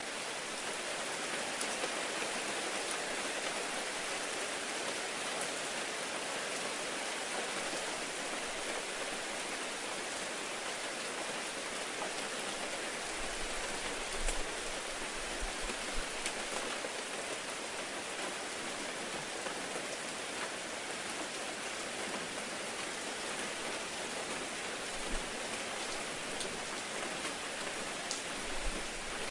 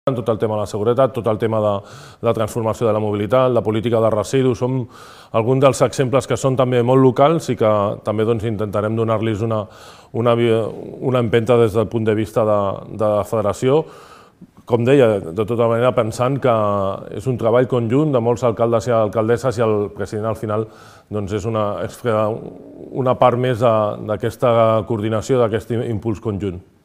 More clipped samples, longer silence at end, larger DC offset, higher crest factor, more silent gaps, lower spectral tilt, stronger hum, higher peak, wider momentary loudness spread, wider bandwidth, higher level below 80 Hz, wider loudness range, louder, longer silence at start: neither; second, 0 s vs 0.25 s; neither; first, 26 dB vs 18 dB; neither; second, -1 dB/octave vs -7 dB/octave; neither; second, -14 dBFS vs 0 dBFS; second, 3 LU vs 9 LU; second, 11.5 kHz vs 15.5 kHz; about the same, -52 dBFS vs -50 dBFS; about the same, 3 LU vs 3 LU; second, -37 LUFS vs -18 LUFS; about the same, 0 s vs 0.05 s